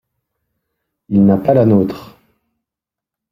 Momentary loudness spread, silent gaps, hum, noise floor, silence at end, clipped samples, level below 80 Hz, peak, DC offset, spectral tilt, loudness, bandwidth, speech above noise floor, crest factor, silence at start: 10 LU; none; none; -86 dBFS; 1.25 s; under 0.1%; -52 dBFS; 0 dBFS; under 0.1%; -10.5 dB/octave; -13 LUFS; 5.8 kHz; 74 dB; 16 dB; 1.1 s